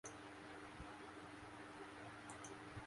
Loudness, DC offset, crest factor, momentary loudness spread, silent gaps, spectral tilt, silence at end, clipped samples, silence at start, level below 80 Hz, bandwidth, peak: -55 LUFS; under 0.1%; 18 dB; 2 LU; none; -4 dB/octave; 0 s; under 0.1%; 0.05 s; -70 dBFS; 11.5 kHz; -38 dBFS